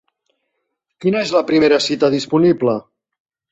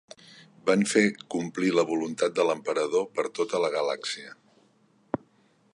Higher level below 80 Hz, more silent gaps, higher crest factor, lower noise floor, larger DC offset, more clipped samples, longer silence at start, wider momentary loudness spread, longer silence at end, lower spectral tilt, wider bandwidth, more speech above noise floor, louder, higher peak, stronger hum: first, -58 dBFS vs -72 dBFS; neither; about the same, 16 dB vs 20 dB; first, -74 dBFS vs -64 dBFS; neither; neither; first, 1 s vs 0.65 s; second, 6 LU vs 13 LU; second, 0.7 s vs 1.4 s; about the same, -5.5 dB/octave vs -4.5 dB/octave; second, 8.2 kHz vs 11.5 kHz; first, 59 dB vs 38 dB; first, -16 LUFS vs -27 LUFS; first, -2 dBFS vs -8 dBFS; neither